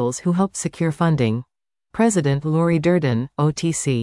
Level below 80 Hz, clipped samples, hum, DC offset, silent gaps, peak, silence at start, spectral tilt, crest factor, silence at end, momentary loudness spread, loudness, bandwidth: -52 dBFS; under 0.1%; none; under 0.1%; none; -6 dBFS; 0 s; -6 dB/octave; 12 dB; 0 s; 5 LU; -20 LUFS; 12 kHz